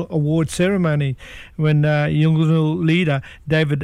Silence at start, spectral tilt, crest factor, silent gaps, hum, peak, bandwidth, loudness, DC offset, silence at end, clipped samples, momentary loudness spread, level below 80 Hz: 0 s; -7 dB/octave; 12 dB; none; none; -6 dBFS; 11.5 kHz; -18 LUFS; under 0.1%; 0 s; under 0.1%; 7 LU; -46 dBFS